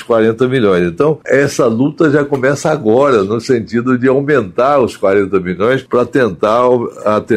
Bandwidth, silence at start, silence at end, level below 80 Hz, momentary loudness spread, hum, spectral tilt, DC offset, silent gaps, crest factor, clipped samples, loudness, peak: 13.5 kHz; 0 s; 0 s; -50 dBFS; 4 LU; none; -6.5 dB/octave; under 0.1%; none; 12 dB; under 0.1%; -12 LUFS; 0 dBFS